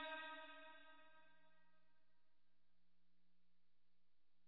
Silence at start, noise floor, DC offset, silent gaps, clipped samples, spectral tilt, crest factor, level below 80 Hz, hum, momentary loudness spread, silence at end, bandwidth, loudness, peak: 0 s; under -90 dBFS; under 0.1%; none; under 0.1%; 1 dB/octave; 22 dB; under -90 dBFS; 60 Hz at -95 dBFS; 16 LU; 2.7 s; 4.6 kHz; -56 LUFS; -40 dBFS